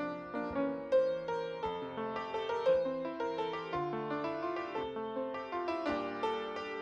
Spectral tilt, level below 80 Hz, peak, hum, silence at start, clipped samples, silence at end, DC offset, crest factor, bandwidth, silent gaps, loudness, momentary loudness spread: -6 dB/octave; -68 dBFS; -20 dBFS; none; 0 s; under 0.1%; 0 s; under 0.1%; 16 dB; 7.6 kHz; none; -36 LUFS; 8 LU